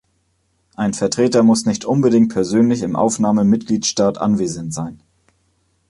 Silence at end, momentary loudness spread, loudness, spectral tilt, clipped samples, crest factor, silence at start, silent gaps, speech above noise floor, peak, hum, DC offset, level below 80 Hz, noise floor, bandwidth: 0.95 s; 9 LU; -17 LUFS; -5.5 dB/octave; under 0.1%; 14 dB; 0.8 s; none; 48 dB; -2 dBFS; none; under 0.1%; -52 dBFS; -64 dBFS; 11.5 kHz